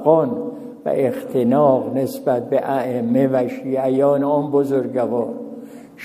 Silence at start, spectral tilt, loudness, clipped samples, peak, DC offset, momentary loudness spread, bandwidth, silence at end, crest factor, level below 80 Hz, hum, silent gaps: 0 s; -8.5 dB/octave; -19 LUFS; under 0.1%; 0 dBFS; under 0.1%; 12 LU; 15.5 kHz; 0 s; 18 dB; -68 dBFS; none; none